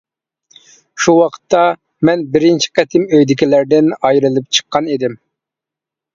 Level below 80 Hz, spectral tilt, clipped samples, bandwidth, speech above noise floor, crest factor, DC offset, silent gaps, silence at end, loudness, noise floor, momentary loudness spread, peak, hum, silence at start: -56 dBFS; -4.5 dB/octave; under 0.1%; 7.6 kHz; 73 dB; 14 dB; under 0.1%; none; 1 s; -13 LUFS; -85 dBFS; 5 LU; 0 dBFS; none; 0.95 s